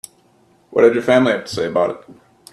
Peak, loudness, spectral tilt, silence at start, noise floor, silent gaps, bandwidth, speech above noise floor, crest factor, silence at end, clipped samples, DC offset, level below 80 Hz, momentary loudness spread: 0 dBFS; -16 LUFS; -5.5 dB/octave; 0.7 s; -55 dBFS; none; 13 kHz; 39 dB; 18 dB; 0.4 s; under 0.1%; under 0.1%; -60 dBFS; 9 LU